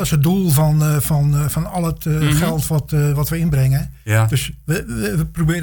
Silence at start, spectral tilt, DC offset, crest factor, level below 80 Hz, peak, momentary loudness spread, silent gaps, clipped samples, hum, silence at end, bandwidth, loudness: 0 s; -6 dB/octave; under 0.1%; 12 dB; -32 dBFS; -4 dBFS; 7 LU; none; under 0.1%; none; 0 s; 19.5 kHz; -18 LUFS